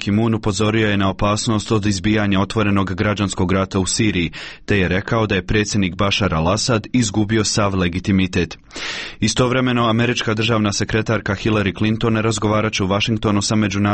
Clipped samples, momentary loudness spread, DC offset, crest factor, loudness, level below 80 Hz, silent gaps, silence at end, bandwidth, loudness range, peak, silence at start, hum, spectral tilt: under 0.1%; 3 LU; under 0.1%; 14 dB; -18 LUFS; -38 dBFS; none; 0 s; 8.8 kHz; 1 LU; -4 dBFS; 0 s; none; -5 dB/octave